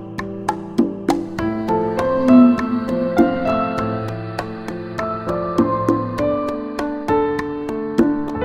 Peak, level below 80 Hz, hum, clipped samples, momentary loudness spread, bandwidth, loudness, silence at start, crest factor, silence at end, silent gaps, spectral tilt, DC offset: 0 dBFS; -44 dBFS; none; under 0.1%; 11 LU; 11.5 kHz; -19 LUFS; 0 s; 18 dB; 0 s; none; -7.5 dB/octave; under 0.1%